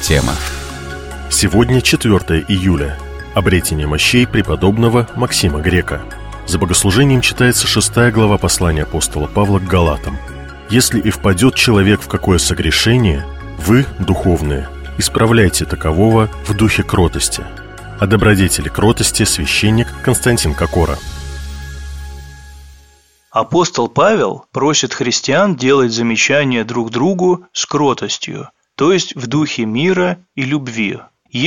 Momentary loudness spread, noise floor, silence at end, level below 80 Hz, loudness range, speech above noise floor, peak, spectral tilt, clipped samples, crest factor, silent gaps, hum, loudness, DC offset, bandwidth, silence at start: 15 LU; -49 dBFS; 0 s; -28 dBFS; 4 LU; 36 dB; 0 dBFS; -4.5 dB/octave; under 0.1%; 14 dB; none; none; -14 LUFS; under 0.1%; 16.5 kHz; 0 s